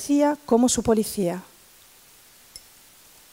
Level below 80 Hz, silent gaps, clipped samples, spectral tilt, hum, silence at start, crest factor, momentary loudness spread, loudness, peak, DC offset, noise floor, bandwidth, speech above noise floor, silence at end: -54 dBFS; none; under 0.1%; -4.5 dB/octave; none; 0 s; 18 dB; 25 LU; -22 LUFS; -6 dBFS; under 0.1%; -52 dBFS; 16.5 kHz; 31 dB; 0.75 s